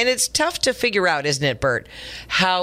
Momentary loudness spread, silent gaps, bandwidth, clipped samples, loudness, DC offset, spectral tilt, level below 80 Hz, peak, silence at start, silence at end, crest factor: 7 LU; none; 16 kHz; under 0.1%; -20 LUFS; under 0.1%; -2.5 dB/octave; -46 dBFS; -6 dBFS; 0 s; 0 s; 16 dB